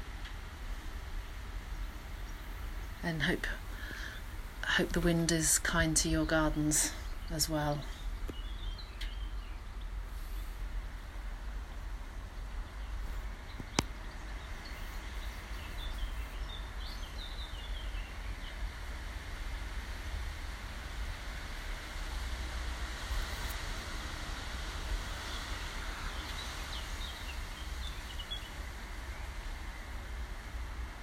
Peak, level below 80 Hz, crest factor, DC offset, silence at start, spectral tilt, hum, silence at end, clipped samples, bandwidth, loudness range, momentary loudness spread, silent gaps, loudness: -8 dBFS; -42 dBFS; 30 dB; under 0.1%; 0 s; -3.5 dB/octave; none; 0 s; under 0.1%; 16 kHz; 13 LU; 15 LU; none; -38 LUFS